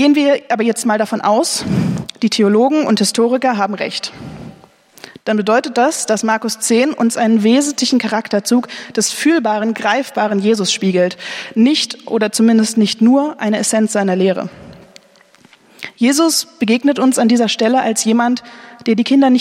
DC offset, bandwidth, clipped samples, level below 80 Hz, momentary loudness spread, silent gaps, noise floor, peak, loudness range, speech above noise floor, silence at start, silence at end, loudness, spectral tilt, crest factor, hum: under 0.1%; 15.5 kHz; under 0.1%; -58 dBFS; 8 LU; none; -48 dBFS; -2 dBFS; 3 LU; 34 dB; 0 s; 0 s; -14 LUFS; -4 dB/octave; 14 dB; none